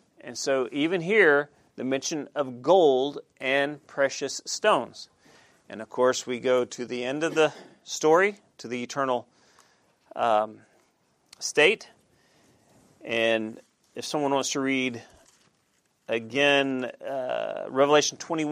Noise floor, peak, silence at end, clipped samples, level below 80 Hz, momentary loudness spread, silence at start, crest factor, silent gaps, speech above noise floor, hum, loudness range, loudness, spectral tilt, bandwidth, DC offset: -70 dBFS; -4 dBFS; 0 s; under 0.1%; -78 dBFS; 15 LU; 0.25 s; 22 dB; none; 44 dB; none; 5 LU; -25 LUFS; -3 dB/octave; 15 kHz; under 0.1%